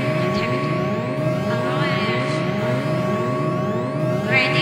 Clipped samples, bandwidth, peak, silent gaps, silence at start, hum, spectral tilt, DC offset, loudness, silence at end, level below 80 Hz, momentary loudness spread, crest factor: under 0.1%; 15.5 kHz; -4 dBFS; none; 0 s; none; -6.5 dB/octave; under 0.1%; -21 LUFS; 0 s; -54 dBFS; 4 LU; 16 dB